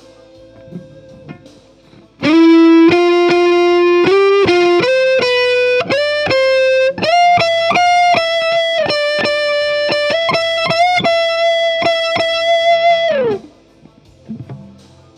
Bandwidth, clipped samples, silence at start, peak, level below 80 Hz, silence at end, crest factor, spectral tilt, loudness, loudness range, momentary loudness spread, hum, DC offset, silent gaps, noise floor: 10 kHz; under 0.1%; 0.7 s; 0 dBFS; -52 dBFS; 0.5 s; 12 dB; -4.5 dB/octave; -12 LUFS; 4 LU; 5 LU; none; under 0.1%; none; -45 dBFS